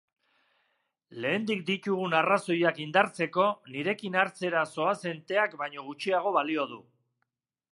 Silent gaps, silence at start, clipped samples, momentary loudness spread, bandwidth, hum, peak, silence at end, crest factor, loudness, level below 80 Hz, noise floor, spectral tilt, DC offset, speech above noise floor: none; 1.1 s; under 0.1%; 9 LU; 11.5 kHz; none; -6 dBFS; 0.9 s; 24 dB; -28 LUFS; -82 dBFS; -82 dBFS; -5 dB/octave; under 0.1%; 54 dB